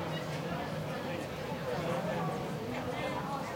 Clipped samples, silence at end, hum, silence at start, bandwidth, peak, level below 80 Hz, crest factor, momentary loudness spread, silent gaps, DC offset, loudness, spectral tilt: under 0.1%; 0 s; none; 0 s; 16.5 kHz; -22 dBFS; -60 dBFS; 14 dB; 4 LU; none; under 0.1%; -37 LUFS; -6 dB/octave